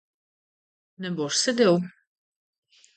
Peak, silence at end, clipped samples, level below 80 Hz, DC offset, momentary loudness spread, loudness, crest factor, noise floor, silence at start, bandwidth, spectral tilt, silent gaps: -8 dBFS; 1.1 s; under 0.1%; -76 dBFS; under 0.1%; 16 LU; -23 LUFS; 20 dB; under -90 dBFS; 1 s; 9.2 kHz; -4 dB/octave; none